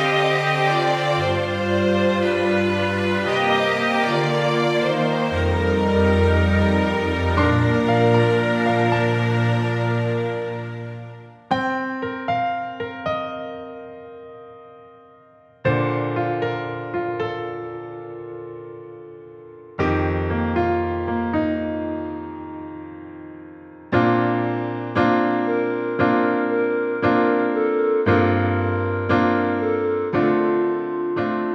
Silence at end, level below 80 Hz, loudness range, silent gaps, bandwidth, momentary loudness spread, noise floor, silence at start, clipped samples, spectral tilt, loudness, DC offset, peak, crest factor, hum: 0 s; -42 dBFS; 9 LU; none; 11.5 kHz; 17 LU; -51 dBFS; 0 s; under 0.1%; -7 dB/octave; -21 LUFS; under 0.1%; -4 dBFS; 16 dB; none